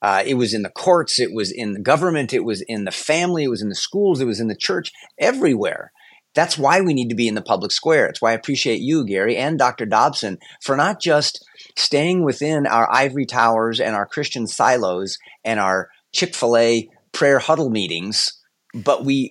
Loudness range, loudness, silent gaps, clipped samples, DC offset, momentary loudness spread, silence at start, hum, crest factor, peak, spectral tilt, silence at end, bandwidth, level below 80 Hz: 2 LU; -19 LUFS; none; under 0.1%; under 0.1%; 8 LU; 0 s; none; 18 dB; -2 dBFS; -4 dB/octave; 0 s; 12 kHz; -72 dBFS